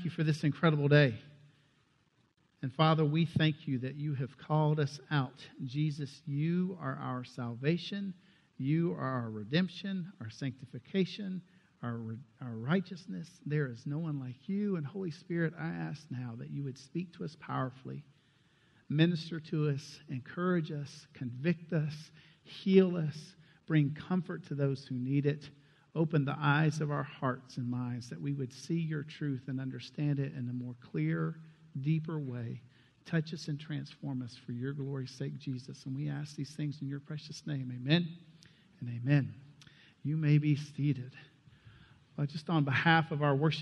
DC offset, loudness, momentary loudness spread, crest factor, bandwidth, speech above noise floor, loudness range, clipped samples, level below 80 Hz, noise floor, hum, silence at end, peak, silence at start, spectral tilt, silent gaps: under 0.1%; -34 LUFS; 14 LU; 22 dB; 9 kHz; 38 dB; 7 LU; under 0.1%; -74 dBFS; -72 dBFS; none; 0 s; -12 dBFS; 0 s; -7.5 dB/octave; none